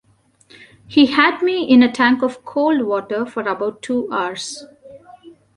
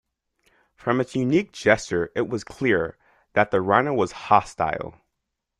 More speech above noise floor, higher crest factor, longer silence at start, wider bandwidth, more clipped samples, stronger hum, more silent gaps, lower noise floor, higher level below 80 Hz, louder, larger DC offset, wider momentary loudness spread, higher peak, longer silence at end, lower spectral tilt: second, 37 dB vs 58 dB; second, 16 dB vs 22 dB; about the same, 0.9 s vs 0.85 s; about the same, 11 kHz vs 11.5 kHz; neither; neither; neither; second, -54 dBFS vs -81 dBFS; about the same, -60 dBFS vs -56 dBFS; first, -17 LUFS vs -23 LUFS; neither; first, 11 LU vs 8 LU; about the same, -2 dBFS vs -2 dBFS; second, 0.3 s vs 0.7 s; second, -4 dB/octave vs -6 dB/octave